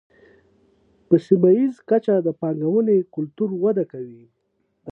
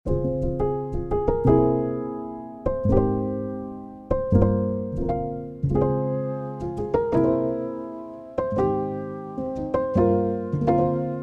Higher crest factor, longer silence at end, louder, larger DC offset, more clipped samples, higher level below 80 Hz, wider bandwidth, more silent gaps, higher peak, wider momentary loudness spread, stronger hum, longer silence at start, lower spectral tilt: about the same, 18 dB vs 18 dB; about the same, 0 s vs 0 s; first, -20 LUFS vs -24 LUFS; neither; neither; second, -70 dBFS vs -36 dBFS; second, 5.6 kHz vs 6.6 kHz; neither; about the same, -4 dBFS vs -6 dBFS; about the same, 13 LU vs 12 LU; neither; first, 1.1 s vs 0.05 s; about the same, -10.5 dB/octave vs -11 dB/octave